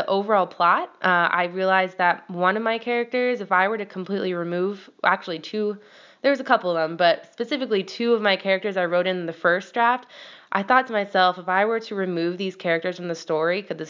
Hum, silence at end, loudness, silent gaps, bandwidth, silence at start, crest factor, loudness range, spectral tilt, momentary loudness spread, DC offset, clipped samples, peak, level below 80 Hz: none; 0 s; -23 LUFS; none; 7.6 kHz; 0 s; 20 dB; 3 LU; -5.5 dB/octave; 8 LU; under 0.1%; under 0.1%; -4 dBFS; -86 dBFS